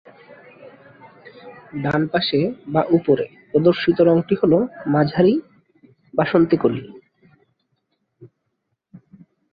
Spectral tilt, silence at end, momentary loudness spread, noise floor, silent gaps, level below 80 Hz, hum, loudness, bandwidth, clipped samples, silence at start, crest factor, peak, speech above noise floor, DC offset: -9.5 dB/octave; 1.25 s; 7 LU; -74 dBFS; none; -56 dBFS; none; -19 LUFS; 5 kHz; under 0.1%; 0.3 s; 18 dB; -4 dBFS; 57 dB; under 0.1%